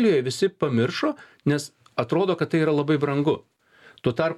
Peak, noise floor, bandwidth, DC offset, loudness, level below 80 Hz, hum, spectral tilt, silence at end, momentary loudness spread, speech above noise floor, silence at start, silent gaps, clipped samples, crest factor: -8 dBFS; -54 dBFS; 13.5 kHz; under 0.1%; -24 LUFS; -64 dBFS; none; -6.5 dB/octave; 0 s; 7 LU; 31 dB; 0 s; none; under 0.1%; 16 dB